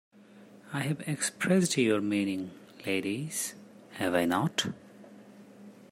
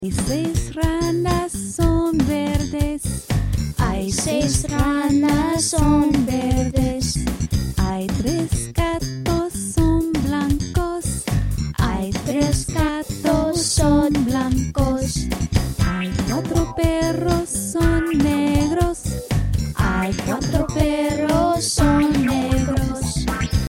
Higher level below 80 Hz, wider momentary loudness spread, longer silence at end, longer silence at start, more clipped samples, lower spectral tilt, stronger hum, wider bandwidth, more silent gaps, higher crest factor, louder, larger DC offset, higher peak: second, -74 dBFS vs -28 dBFS; first, 16 LU vs 6 LU; about the same, 0.05 s vs 0 s; first, 0.35 s vs 0 s; neither; about the same, -4.5 dB/octave vs -5.5 dB/octave; neither; about the same, 16 kHz vs 16.5 kHz; neither; about the same, 20 dB vs 16 dB; second, -30 LUFS vs -20 LUFS; neither; second, -12 dBFS vs -4 dBFS